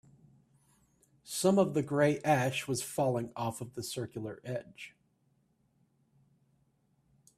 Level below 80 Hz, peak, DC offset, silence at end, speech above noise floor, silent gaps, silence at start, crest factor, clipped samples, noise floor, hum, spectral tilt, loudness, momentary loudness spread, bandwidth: -70 dBFS; -14 dBFS; under 0.1%; 2.5 s; 41 dB; none; 1.25 s; 22 dB; under 0.1%; -73 dBFS; none; -5 dB/octave; -32 LUFS; 14 LU; 15.5 kHz